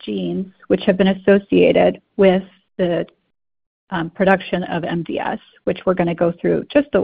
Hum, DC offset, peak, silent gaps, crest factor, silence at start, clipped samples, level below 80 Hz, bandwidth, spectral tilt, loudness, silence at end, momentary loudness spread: none; under 0.1%; 0 dBFS; 3.66-3.87 s; 18 dB; 0.05 s; under 0.1%; -50 dBFS; 4.9 kHz; -10 dB/octave; -18 LUFS; 0 s; 11 LU